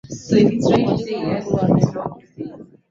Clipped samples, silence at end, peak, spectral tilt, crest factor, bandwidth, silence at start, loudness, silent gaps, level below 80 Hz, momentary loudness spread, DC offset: under 0.1%; 0.3 s; -2 dBFS; -7.5 dB/octave; 18 dB; 7.6 kHz; 0.1 s; -18 LUFS; none; -48 dBFS; 18 LU; under 0.1%